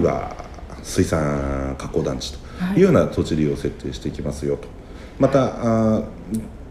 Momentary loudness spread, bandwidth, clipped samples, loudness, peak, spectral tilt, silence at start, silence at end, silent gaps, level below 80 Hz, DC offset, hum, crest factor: 15 LU; 15 kHz; under 0.1%; -22 LUFS; -2 dBFS; -6.5 dB/octave; 0 s; 0 s; none; -36 dBFS; under 0.1%; none; 18 dB